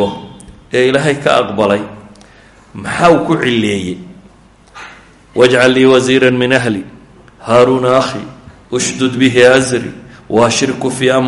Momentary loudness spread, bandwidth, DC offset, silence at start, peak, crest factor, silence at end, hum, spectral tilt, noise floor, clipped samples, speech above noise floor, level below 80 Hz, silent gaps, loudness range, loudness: 19 LU; 11.5 kHz; under 0.1%; 0 s; 0 dBFS; 12 dB; 0 s; none; -4.5 dB/octave; -43 dBFS; under 0.1%; 32 dB; -46 dBFS; none; 5 LU; -11 LUFS